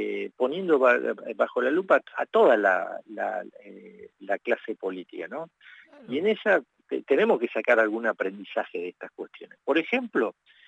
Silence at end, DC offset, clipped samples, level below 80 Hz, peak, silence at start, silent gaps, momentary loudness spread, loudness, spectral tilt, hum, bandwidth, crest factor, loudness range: 0.35 s; under 0.1%; under 0.1%; -90 dBFS; -8 dBFS; 0 s; none; 16 LU; -25 LUFS; -6 dB/octave; none; 8 kHz; 18 dB; 8 LU